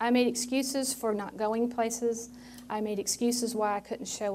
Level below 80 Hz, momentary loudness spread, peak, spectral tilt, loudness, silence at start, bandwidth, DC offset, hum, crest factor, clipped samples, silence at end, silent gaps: -66 dBFS; 9 LU; -14 dBFS; -3 dB/octave; -30 LUFS; 0 s; 16 kHz; under 0.1%; none; 16 dB; under 0.1%; 0 s; none